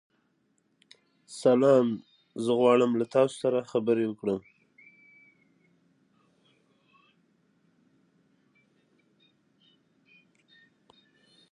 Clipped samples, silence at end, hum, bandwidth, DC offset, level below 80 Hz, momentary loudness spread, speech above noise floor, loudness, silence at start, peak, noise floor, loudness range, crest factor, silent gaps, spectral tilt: under 0.1%; 7.1 s; none; 11 kHz; under 0.1%; -78 dBFS; 13 LU; 47 dB; -26 LUFS; 1.3 s; -10 dBFS; -72 dBFS; 10 LU; 20 dB; none; -6.5 dB/octave